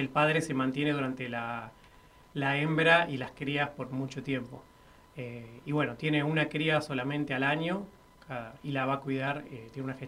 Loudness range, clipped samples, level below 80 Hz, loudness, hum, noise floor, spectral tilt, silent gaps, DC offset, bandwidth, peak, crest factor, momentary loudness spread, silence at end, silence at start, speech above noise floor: 4 LU; under 0.1%; -64 dBFS; -31 LUFS; none; -57 dBFS; -6 dB/octave; none; under 0.1%; 14 kHz; -8 dBFS; 24 dB; 16 LU; 0 s; 0 s; 26 dB